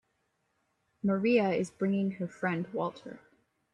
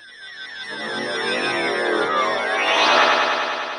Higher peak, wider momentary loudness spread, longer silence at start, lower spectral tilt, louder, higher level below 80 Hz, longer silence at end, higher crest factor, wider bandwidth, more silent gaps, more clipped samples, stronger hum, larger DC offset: second, -14 dBFS vs -4 dBFS; second, 10 LU vs 16 LU; first, 1.05 s vs 0 s; first, -7.5 dB/octave vs -2 dB/octave; second, -31 LUFS vs -19 LUFS; second, -72 dBFS vs -66 dBFS; first, 0.55 s vs 0 s; about the same, 18 dB vs 18 dB; about the same, 10.5 kHz vs 10 kHz; neither; neither; neither; neither